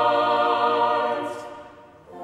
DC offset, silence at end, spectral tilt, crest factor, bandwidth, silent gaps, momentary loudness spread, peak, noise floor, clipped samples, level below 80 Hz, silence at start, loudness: under 0.1%; 0 s; -4.5 dB/octave; 16 dB; 12 kHz; none; 18 LU; -8 dBFS; -46 dBFS; under 0.1%; -66 dBFS; 0 s; -22 LUFS